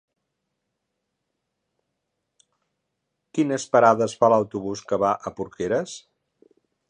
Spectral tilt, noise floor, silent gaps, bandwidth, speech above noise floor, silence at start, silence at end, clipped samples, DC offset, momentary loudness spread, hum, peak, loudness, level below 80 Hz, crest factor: -5.5 dB/octave; -80 dBFS; none; 10 kHz; 58 dB; 3.35 s; 0.9 s; under 0.1%; under 0.1%; 14 LU; none; -2 dBFS; -22 LUFS; -64 dBFS; 24 dB